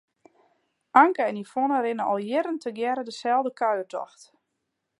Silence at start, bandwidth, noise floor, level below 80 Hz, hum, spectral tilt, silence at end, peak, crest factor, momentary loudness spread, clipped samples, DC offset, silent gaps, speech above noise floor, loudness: 0.95 s; 11.5 kHz; -80 dBFS; -84 dBFS; none; -5 dB/octave; 0.95 s; -4 dBFS; 22 dB; 11 LU; under 0.1%; under 0.1%; none; 55 dB; -25 LUFS